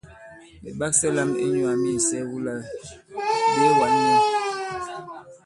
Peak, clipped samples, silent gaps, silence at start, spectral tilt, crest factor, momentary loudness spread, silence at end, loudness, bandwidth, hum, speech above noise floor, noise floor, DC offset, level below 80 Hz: -6 dBFS; under 0.1%; none; 0.05 s; -3.5 dB/octave; 18 dB; 19 LU; 0.1 s; -22 LUFS; 11.5 kHz; none; 24 dB; -46 dBFS; under 0.1%; -58 dBFS